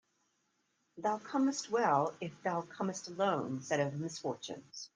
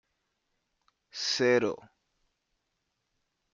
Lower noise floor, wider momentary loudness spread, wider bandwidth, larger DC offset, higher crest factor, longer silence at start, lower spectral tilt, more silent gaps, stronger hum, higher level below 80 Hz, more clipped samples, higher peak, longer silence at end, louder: about the same, -79 dBFS vs -81 dBFS; second, 9 LU vs 19 LU; first, 10 kHz vs 7.6 kHz; neither; about the same, 20 dB vs 22 dB; second, 0.95 s vs 1.15 s; first, -5 dB/octave vs -3.5 dB/octave; neither; neither; second, -82 dBFS vs -76 dBFS; neither; about the same, -16 dBFS vs -14 dBFS; second, 0.1 s vs 1.8 s; second, -35 LUFS vs -28 LUFS